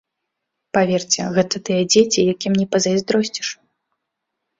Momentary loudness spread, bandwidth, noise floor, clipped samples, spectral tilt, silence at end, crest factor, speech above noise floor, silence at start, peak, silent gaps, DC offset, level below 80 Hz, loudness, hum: 9 LU; 7.8 kHz; -79 dBFS; under 0.1%; -4 dB/octave; 1.05 s; 18 dB; 61 dB; 0.75 s; -2 dBFS; none; under 0.1%; -58 dBFS; -18 LUFS; none